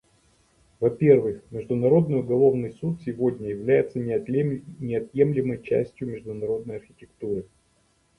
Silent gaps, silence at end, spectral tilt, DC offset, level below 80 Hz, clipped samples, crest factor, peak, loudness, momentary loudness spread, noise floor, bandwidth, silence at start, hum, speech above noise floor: none; 0.75 s; -10 dB/octave; under 0.1%; -58 dBFS; under 0.1%; 20 dB; -6 dBFS; -24 LUFS; 13 LU; -65 dBFS; 10.5 kHz; 0.8 s; none; 41 dB